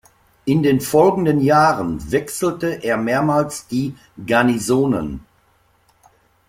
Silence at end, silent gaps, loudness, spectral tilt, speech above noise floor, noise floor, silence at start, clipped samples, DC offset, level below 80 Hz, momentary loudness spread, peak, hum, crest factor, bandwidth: 1.3 s; none; -18 LUFS; -6 dB/octave; 41 dB; -59 dBFS; 0.45 s; under 0.1%; under 0.1%; -46 dBFS; 9 LU; -2 dBFS; none; 16 dB; 16.5 kHz